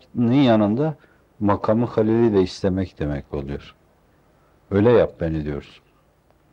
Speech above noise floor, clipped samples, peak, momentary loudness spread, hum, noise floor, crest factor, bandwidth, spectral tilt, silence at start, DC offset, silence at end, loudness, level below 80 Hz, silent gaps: 39 dB; under 0.1%; -4 dBFS; 14 LU; none; -59 dBFS; 16 dB; 8.4 kHz; -8.5 dB/octave; 0.15 s; under 0.1%; 0.9 s; -20 LUFS; -46 dBFS; none